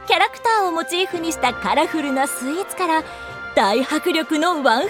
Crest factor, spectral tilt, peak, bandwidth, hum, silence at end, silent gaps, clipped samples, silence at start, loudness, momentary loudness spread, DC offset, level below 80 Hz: 18 dB; -2.5 dB/octave; -2 dBFS; 17.5 kHz; none; 0 s; none; under 0.1%; 0 s; -19 LUFS; 5 LU; under 0.1%; -52 dBFS